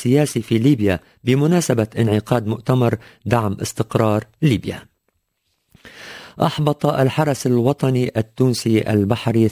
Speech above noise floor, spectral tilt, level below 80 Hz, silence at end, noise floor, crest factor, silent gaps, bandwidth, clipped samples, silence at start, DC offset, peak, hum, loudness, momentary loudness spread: 53 dB; -6.5 dB/octave; -46 dBFS; 0 s; -70 dBFS; 18 dB; none; 16 kHz; under 0.1%; 0 s; under 0.1%; -2 dBFS; none; -19 LUFS; 7 LU